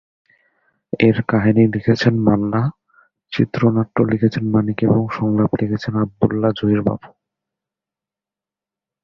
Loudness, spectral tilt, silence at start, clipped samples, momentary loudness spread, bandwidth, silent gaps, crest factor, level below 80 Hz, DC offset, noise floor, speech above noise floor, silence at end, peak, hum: -18 LUFS; -8.5 dB/octave; 0.95 s; under 0.1%; 6 LU; 7 kHz; none; 16 dB; -48 dBFS; under 0.1%; -89 dBFS; 72 dB; 1.95 s; -2 dBFS; none